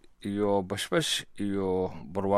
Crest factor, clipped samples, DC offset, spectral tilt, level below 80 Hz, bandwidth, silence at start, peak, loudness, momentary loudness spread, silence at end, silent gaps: 18 dB; under 0.1%; under 0.1%; -4.5 dB/octave; -58 dBFS; 15.5 kHz; 0.05 s; -12 dBFS; -30 LUFS; 6 LU; 0 s; none